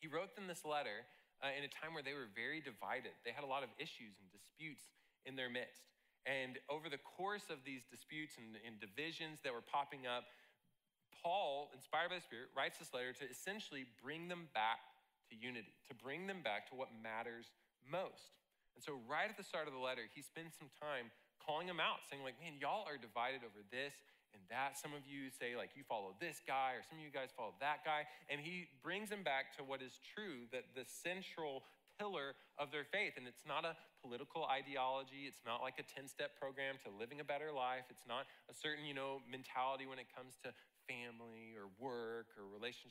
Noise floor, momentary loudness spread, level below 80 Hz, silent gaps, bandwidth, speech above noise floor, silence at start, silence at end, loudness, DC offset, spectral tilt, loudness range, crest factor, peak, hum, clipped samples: -84 dBFS; 12 LU; under -90 dBFS; none; 16 kHz; 37 dB; 0 s; 0 s; -47 LUFS; under 0.1%; -3.5 dB/octave; 4 LU; 20 dB; -28 dBFS; none; under 0.1%